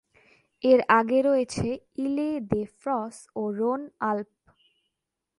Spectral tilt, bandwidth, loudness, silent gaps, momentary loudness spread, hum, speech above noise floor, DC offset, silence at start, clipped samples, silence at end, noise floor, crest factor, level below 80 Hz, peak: -6 dB/octave; 11.5 kHz; -26 LUFS; none; 12 LU; none; 59 dB; under 0.1%; 0.65 s; under 0.1%; 1.15 s; -85 dBFS; 22 dB; -58 dBFS; -6 dBFS